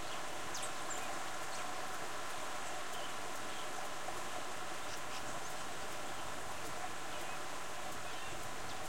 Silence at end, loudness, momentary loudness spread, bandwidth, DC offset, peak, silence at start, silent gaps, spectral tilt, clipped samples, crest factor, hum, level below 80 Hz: 0 s; -43 LUFS; 2 LU; 16.5 kHz; 0.9%; -28 dBFS; 0 s; none; -2 dB/octave; under 0.1%; 14 dB; none; -66 dBFS